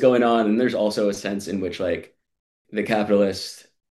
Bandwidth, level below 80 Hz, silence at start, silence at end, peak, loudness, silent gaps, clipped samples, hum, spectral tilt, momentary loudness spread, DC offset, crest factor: 12.5 kHz; -62 dBFS; 0 s; 0.3 s; -4 dBFS; -22 LUFS; 2.40-2.65 s; under 0.1%; none; -5.5 dB/octave; 12 LU; under 0.1%; 18 dB